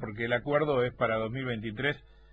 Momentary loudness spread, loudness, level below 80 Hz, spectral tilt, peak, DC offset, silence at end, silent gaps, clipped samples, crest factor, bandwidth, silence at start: 7 LU; -30 LUFS; -56 dBFS; -8.5 dB/octave; -14 dBFS; under 0.1%; 0.35 s; none; under 0.1%; 16 dB; 8 kHz; 0 s